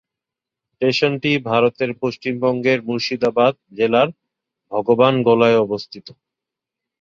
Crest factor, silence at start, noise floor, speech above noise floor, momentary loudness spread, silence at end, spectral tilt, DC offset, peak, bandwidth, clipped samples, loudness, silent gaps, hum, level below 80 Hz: 18 dB; 0.8 s; -86 dBFS; 68 dB; 9 LU; 0.9 s; -6.5 dB/octave; under 0.1%; -2 dBFS; 7.4 kHz; under 0.1%; -18 LUFS; none; none; -60 dBFS